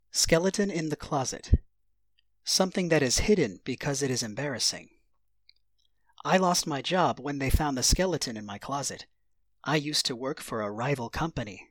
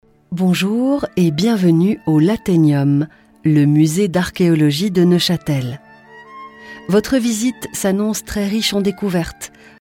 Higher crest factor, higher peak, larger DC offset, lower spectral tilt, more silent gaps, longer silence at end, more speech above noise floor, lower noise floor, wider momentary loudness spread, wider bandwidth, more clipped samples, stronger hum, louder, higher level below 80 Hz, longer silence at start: first, 22 dB vs 12 dB; second, -8 dBFS vs -4 dBFS; neither; second, -3.5 dB/octave vs -6 dB/octave; neither; second, 0.1 s vs 0.35 s; first, 50 dB vs 26 dB; first, -77 dBFS vs -41 dBFS; second, 10 LU vs 14 LU; first, 19 kHz vs 16.5 kHz; neither; neither; second, -28 LUFS vs -16 LUFS; first, -38 dBFS vs -46 dBFS; second, 0.15 s vs 0.3 s